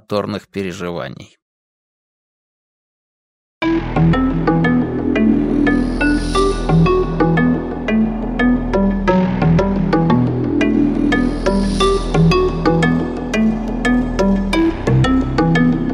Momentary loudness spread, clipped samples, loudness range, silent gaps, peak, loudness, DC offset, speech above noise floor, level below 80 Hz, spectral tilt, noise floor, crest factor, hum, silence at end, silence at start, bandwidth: 6 LU; under 0.1%; 7 LU; 1.42-3.61 s; -2 dBFS; -16 LUFS; under 0.1%; over 72 dB; -26 dBFS; -7 dB/octave; under -90 dBFS; 14 dB; none; 0 s; 0.1 s; 11 kHz